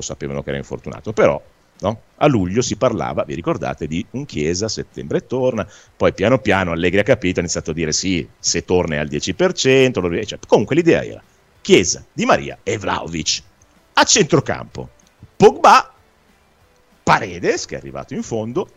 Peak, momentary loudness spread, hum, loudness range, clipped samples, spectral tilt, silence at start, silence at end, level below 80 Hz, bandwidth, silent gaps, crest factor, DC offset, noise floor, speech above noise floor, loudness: 0 dBFS; 13 LU; none; 5 LU; under 0.1%; -4 dB/octave; 0 s; 0.15 s; -44 dBFS; 13.5 kHz; none; 18 dB; under 0.1%; -55 dBFS; 37 dB; -18 LUFS